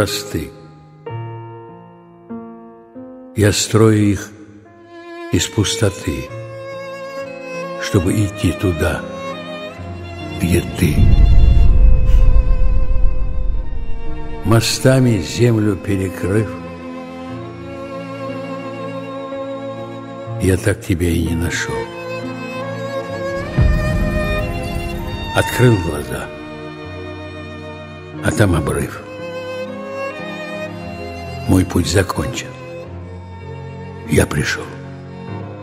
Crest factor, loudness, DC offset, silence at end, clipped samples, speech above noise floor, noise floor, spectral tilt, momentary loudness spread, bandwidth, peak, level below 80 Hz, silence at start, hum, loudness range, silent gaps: 16 dB; -19 LUFS; under 0.1%; 0 s; under 0.1%; 26 dB; -41 dBFS; -5.5 dB/octave; 17 LU; 16 kHz; 0 dBFS; -22 dBFS; 0 s; none; 7 LU; none